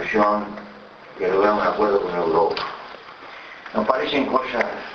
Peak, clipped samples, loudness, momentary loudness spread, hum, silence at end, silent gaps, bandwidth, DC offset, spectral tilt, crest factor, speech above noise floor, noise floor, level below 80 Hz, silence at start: -2 dBFS; under 0.1%; -21 LUFS; 19 LU; none; 0 s; none; 6.8 kHz; under 0.1%; -6 dB/octave; 20 dB; 22 dB; -42 dBFS; -54 dBFS; 0 s